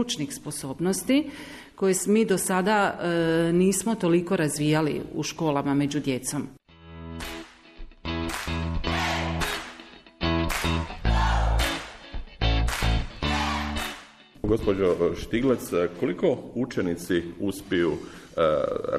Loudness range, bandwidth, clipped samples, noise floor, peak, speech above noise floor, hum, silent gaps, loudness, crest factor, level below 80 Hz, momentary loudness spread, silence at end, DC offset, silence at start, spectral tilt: 7 LU; 14 kHz; under 0.1%; -48 dBFS; -10 dBFS; 23 dB; none; none; -26 LUFS; 16 dB; -34 dBFS; 13 LU; 0 s; under 0.1%; 0 s; -5 dB/octave